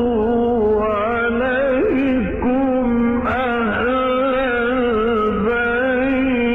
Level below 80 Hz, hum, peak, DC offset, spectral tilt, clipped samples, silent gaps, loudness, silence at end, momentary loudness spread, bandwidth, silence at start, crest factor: -36 dBFS; none; -10 dBFS; under 0.1%; -8.5 dB/octave; under 0.1%; none; -18 LUFS; 0 s; 2 LU; 4 kHz; 0 s; 8 dB